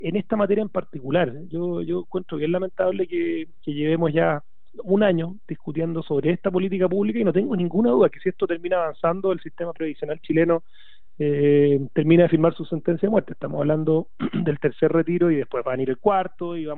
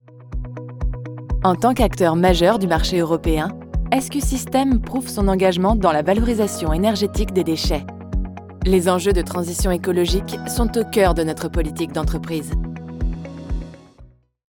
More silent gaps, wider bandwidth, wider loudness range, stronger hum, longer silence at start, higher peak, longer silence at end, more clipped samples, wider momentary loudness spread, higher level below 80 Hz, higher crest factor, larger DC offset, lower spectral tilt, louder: neither; second, 4.1 kHz vs 20 kHz; about the same, 4 LU vs 4 LU; neither; about the same, 0 s vs 0.1 s; second, -6 dBFS vs -2 dBFS; second, 0 s vs 0.5 s; neither; about the same, 11 LU vs 12 LU; second, -60 dBFS vs -26 dBFS; about the same, 16 dB vs 18 dB; first, 1% vs under 0.1%; first, -11.5 dB/octave vs -5.5 dB/octave; second, -23 LUFS vs -20 LUFS